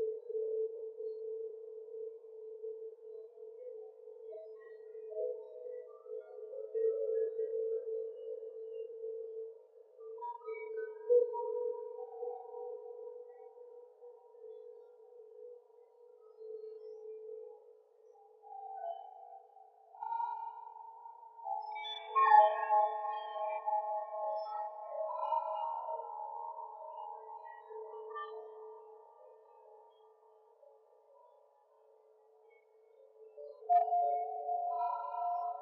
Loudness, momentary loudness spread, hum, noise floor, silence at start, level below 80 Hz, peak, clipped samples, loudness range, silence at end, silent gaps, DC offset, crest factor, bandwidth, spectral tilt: -37 LUFS; 23 LU; none; -67 dBFS; 0 s; under -90 dBFS; -14 dBFS; under 0.1%; 20 LU; 0 s; none; under 0.1%; 26 dB; 5.6 kHz; 5 dB/octave